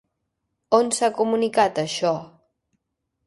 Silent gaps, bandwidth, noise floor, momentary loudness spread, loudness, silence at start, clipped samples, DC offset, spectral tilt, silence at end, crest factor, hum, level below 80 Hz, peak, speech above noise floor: none; 11.5 kHz; -78 dBFS; 5 LU; -22 LUFS; 0.7 s; under 0.1%; under 0.1%; -3.5 dB/octave; 1 s; 20 dB; none; -66 dBFS; -4 dBFS; 57 dB